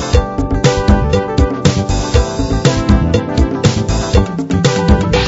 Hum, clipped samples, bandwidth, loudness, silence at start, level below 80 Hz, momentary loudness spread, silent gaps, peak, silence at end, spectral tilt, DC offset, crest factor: none; 0.1%; 8 kHz; -14 LUFS; 0 s; -18 dBFS; 4 LU; none; 0 dBFS; 0 s; -6 dB/octave; under 0.1%; 12 dB